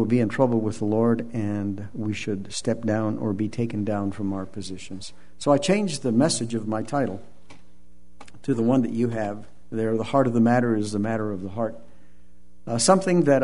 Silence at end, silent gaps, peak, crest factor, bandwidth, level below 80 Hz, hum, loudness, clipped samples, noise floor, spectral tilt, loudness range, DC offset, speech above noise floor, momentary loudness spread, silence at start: 0 s; none; -2 dBFS; 22 dB; 11 kHz; -58 dBFS; none; -24 LUFS; under 0.1%; -57 dBFS; -5.5 dB/octave; 4 LU; 1%; 33 dB; 13 LU; 0 s